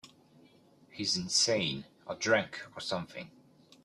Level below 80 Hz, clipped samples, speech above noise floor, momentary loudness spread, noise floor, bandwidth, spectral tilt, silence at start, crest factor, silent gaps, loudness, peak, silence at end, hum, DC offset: -70 dBFS; under 0.1%; 29 dB; 19 LU; -62 dBFS; 13 kHz; -2.5 dB/octave; 0.05 s; 22 dB; none; -31 LUFS; -12 dBFS; 0.55 s; none; under 0.1%